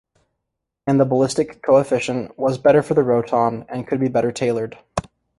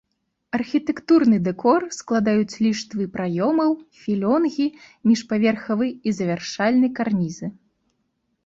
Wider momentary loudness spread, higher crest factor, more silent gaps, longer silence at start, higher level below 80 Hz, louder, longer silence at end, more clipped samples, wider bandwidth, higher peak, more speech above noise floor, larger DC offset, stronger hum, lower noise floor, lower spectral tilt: first, 12 LU vs 8 LU; about the same, 16 dB vs 16 dB; neither; first, 0.85 s vs 0.55 s; first, -52 dBFS vs -62 dBFS; about the same, -19 LUFS vs -21 LUFS; second, 0.4 s vs 0.9 s; neither; first, 11.5 kHz vs 7.8 kHz; first, -2 dBFS vs -6 dBFS; first, 61 dB vs 51 dB; neither; neither; first, -79 dBFS vs -72 dBFS; about the same, -6.5 dB/octave vs -6 dB/octave